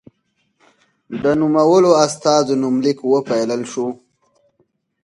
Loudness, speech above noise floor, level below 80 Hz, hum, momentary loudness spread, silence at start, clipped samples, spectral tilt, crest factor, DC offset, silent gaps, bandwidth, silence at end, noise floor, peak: -16 LUFS; 52 dB; -60 dBFS; none; 12 LU; 1.1 s; under 0.1%; -5 dB/octave; 18 dB; under 0.1%; none; 11.5 kHz; 1.1 s; -67 dBFS; 0 dBFS